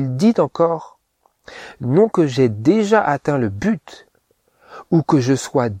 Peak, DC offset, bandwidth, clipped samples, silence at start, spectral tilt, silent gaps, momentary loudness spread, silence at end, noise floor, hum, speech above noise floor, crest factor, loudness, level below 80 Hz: -2 dBFS; under 0.1%; 14 kHz; under 0.1%; 0 s; -7 dB/octave; none; 11 LU; 0 s; -63 dBFS; none; 46 dB; 16 dB; -17 LUFS; -54 dBFS